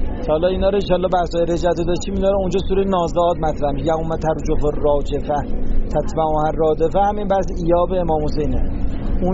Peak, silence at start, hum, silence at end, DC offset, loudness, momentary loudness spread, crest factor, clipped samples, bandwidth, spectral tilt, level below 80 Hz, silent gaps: -4 dBFS; 0 s; none; 0 s; under 0.1%; -19 LUFS; 5 LU; 12 dB; under 0.1%; 7.8 kHz; -6.5 dB/octave; -24 dBFS; none